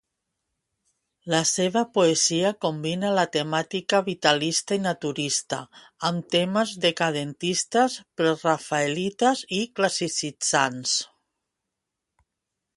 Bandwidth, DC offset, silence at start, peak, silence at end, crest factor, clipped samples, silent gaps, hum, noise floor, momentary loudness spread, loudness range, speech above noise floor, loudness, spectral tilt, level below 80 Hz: 11.5 kHz; under 0.1%; 1.25 s; -4 dBFS; 1.7 s; 22 dB; under 0.1%; none; none; -84 dBFS; 6 LU; 2 LU; 60 dB; -24 LUFS; -3 dB/octave; -68 dBFS